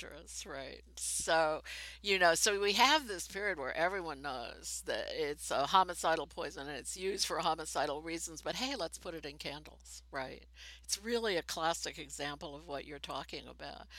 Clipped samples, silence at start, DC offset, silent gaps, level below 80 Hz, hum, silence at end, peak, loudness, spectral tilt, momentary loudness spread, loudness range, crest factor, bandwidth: under 0.1%; 0 s; under 0.1%; none; -60 dBFS; none; 0 s; -10 dBFS; -35 LUFS; -1.5 dB/octave; 16 LU; 8 LU; 26 dB; 16.5 kHz